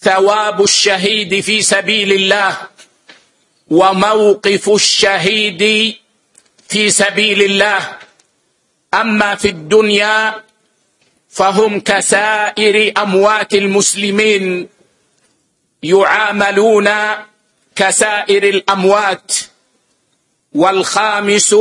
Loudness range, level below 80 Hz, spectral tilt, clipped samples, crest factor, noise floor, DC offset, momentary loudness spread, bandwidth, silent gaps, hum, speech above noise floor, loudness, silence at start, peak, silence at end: 3 LU; -56 dBFS; -2.5 dB/octave; under 0.1%; 14 dB; -62 dBFS; under 0.1%; 8 LU; 11.5 kHz; none; none; 50 dB; -11 LUFS; 0 s; 0 dBFS; 0 s